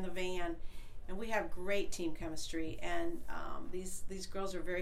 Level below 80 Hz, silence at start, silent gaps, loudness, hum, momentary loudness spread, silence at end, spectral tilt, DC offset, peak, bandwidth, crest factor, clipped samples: -46 dBFS; 0 s; none; -41 LUFS; none; 8 LU; 0 s; -4 dB/octave; under 0.1%; -22 dBFS; 14 kHz; 14 dB; under 0.1%